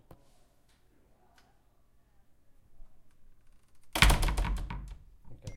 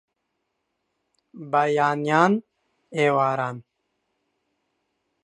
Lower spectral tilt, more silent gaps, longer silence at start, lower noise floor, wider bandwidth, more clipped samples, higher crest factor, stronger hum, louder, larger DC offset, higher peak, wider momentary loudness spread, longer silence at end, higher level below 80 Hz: second, -3.5 dB/octave vs -6.5 dB/octave; neither; first, 2.7 s vs 1.35 s; second, -65 dBFS vs -77 dBFS; first, 16.5 kHz vs 10.5 kHz; neither; first, 32 dB vs 24 dB; neither; second, -29 LUFS vs -22 LUFS; neither; about the same, -4 dBFS vs -2 dBFS; first, 23 LU vs 13 LU; second, 0 s vs 1.6 s; first, -38 dBFS vs -76 dBFS